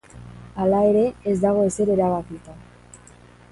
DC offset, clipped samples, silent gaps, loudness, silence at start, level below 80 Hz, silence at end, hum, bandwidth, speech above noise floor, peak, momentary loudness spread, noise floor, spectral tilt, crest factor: under 0.1%; under 0.1%; none; -20 LUFS; 0.15 s; -48 dBFS; 0.55 s; 60 Hz at -40 dBFS; 11.5 kHz; 28 dB; -6 dBFS; 20 LU; -48 dBFS; -7.5 dB/octave; 16 dB